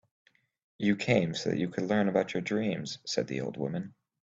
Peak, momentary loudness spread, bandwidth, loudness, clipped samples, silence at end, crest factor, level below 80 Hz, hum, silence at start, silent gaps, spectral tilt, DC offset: -10 dBFS; 8 LU; 7.8 kHz; -31 LUFS; under 0.1%; 0.35 s; 20 dB; -66 dBFS; none; 0.8 s; none; -5.5 dB/octave; under 0.1%